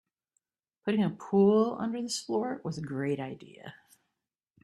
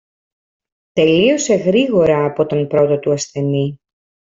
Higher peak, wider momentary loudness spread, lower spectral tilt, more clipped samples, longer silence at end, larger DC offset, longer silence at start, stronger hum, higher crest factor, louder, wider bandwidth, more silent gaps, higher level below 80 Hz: second, -12 dBFS vs -2 dBFS; first, 21 LU vs 7 LU; about the same, -6 dB/octave vs -5.5 dB/octave; neither; first, 0.9 s vs 0.65 s; neither; about the same, 0.85 s vs 0.95 s; neither; about the same, 18 dB vs 14 dB; second, -30 LUFS vs -15 LUFS; first, 12.5 kHz vs 7.8 kHz; neither; second, -74 dBFS vs -54 dBFS